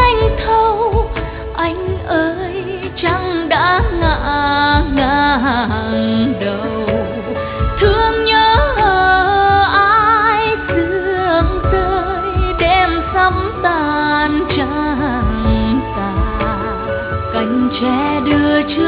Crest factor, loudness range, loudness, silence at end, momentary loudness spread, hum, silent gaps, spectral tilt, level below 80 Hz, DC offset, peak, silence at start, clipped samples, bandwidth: 14 dB; 5 LU; -15 LUFS; 0 s; 8 LU; none; none; -11.5 dB/octave; -24 dBFS; under 0.1%; 0 dBFS; 0 s; under 0.1%; 5 kHz